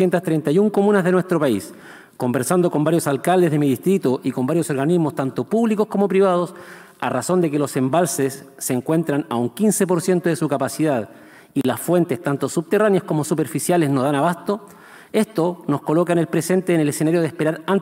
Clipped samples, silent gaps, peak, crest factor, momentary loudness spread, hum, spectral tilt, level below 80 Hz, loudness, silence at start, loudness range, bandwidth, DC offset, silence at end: under 0.1%; none; -4 dBFS; 16 dB; 7 LU; none; -6 dB/octave; -70 dBFS; -20 LUFS; 0 s; 2 LU; 16 kHz; under 0.1%; 0 s